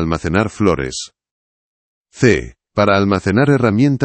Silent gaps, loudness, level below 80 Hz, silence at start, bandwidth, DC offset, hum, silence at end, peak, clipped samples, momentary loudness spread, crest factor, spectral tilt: 1.31-2.05 s; -15 LUFS; -40 dBFS; 0 s; 8.8 kHz; under 0.1%; none; 0 s; 0 dBFS; under 0.1%; 11 LU; 16 dB; -6.5 dB/octave